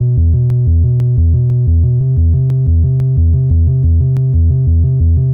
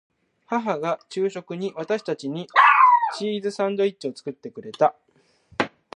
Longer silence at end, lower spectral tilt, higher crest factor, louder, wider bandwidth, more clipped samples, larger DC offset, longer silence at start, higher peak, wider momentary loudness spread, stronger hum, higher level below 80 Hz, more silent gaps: second, 0 s vs 0.3 s; first, -13 dB/octave vs -5 dB/octave; second, 6 dB vs 20 dB; first, -12 LUFS vs -22 LUFS; second, 1 kHz vs 10.5 kHz; neither; neither; second, 0 s vs 0.5 s; about the same, -4 dBFS vs -2 dBFS; second, 1 LU vs 17 LU; neither; first, -16 dBFS vs -72 dBFS; neither